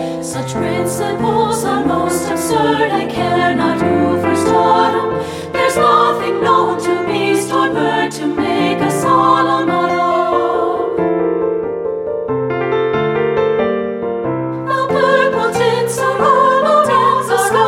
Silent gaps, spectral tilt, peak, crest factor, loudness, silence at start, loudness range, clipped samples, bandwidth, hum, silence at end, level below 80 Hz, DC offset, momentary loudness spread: none; -5 dB/octave; 0 dBFS; 14 dB; -14 LUFS; 0 s; 3 LU; under 0.1%; 16.5 kHz; none; 0 s; -48 dBFS; under 0.1%; 8 LU